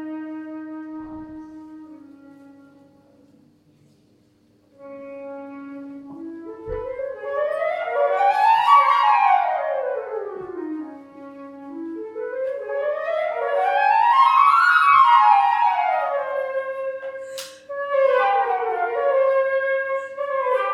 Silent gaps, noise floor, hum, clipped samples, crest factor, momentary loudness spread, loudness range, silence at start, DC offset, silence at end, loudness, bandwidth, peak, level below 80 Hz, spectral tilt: none; -59 dBFS; none; under 0.1%; 20 dB; 23 LU; 22 LU; 0 s; under 0.1%; 0 s; -19 LUFS; 14 kHz; -2 dBFS; -58 dBFS; -3.5 dB/octave